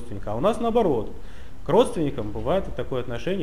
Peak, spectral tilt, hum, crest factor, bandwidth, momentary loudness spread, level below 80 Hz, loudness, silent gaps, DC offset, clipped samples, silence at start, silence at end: -6 dBFS; -6.5 dB/octave; none; 18 dB; 15.5 kHz; 17 LU; -40 dBFS; -25 LUFS; none; 3%; under 0.1%; 0 s; 0 s